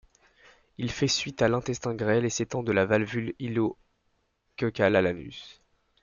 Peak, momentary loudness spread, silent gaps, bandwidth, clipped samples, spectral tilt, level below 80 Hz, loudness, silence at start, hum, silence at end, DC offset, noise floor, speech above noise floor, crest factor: -8 dBFS; 12 LU; none; 7.4 kHz; under 0.1%; -5 dB/octave; -58 dBFS; -27 LUFS; 0.8 s; none; 0.5 s; under 0.1%; -73 dBFS; 46 dB; 20 dB